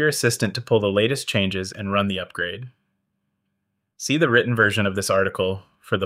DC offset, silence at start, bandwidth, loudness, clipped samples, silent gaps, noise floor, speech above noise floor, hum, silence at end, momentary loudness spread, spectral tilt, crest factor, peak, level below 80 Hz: under 0.1%; 0 s; 16 kHz; -22 LUFS; under 0.1%; none; -76 dBFS; 55 dB; none; 0 s; 10 LU; -4.5 dB/octave; 20 dB; -4 dBFS; -62 dBFS